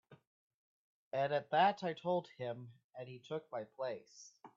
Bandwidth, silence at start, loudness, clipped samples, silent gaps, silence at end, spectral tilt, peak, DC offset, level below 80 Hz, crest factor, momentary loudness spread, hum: 7.6 kHz; 0.1 s; -38 LUFS; under 0.1%; 0.27-1.11 s, 2.84-2.90 s; 0.1 s; -3.5 dB/octave; -18 dBFS; under 0.1%; -86 dBFS; 22 dB; 20 LU; none